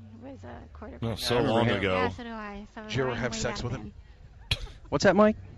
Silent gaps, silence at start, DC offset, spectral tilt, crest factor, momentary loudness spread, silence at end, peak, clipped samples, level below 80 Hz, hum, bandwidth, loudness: none; 0 s; under 0.1%; -5 dB/octave; 20 dB; 21 LU; 0 s; -10 dBFS; under 0.1%; -46 dBFS; none; 13 kHz; -28 LUFS